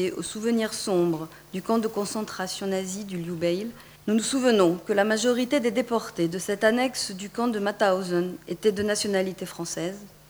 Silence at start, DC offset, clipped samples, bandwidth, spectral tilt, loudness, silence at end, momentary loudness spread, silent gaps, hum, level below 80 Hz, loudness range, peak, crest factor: 0 s; under 0.1%; under 0.1%; over 20 kHz; -4.5 dB/octave; -26 LUFS; 0.2 s; 10 LU; none; none; -62 dBFS; 4 LU; -8 dBFS; 18 dB